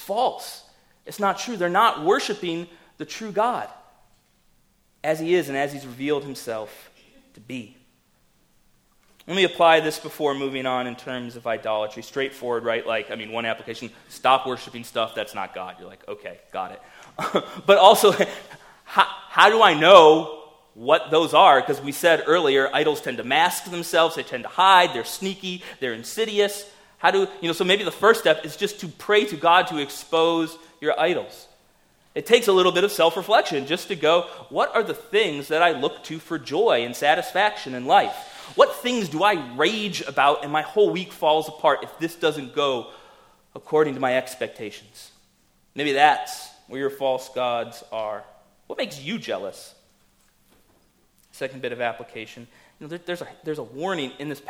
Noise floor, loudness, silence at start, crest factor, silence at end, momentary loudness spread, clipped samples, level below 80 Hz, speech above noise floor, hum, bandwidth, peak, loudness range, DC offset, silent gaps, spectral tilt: -62 dBFS; -21 LUFS; 0 s; 22 dB; 0.1 s; 19 LU; under 0.1%; -66 dBFS; 41 dB; none; 17 kHz; 0 dBFS; 14 LU; under 0.1%; none; -3.5 dB/octave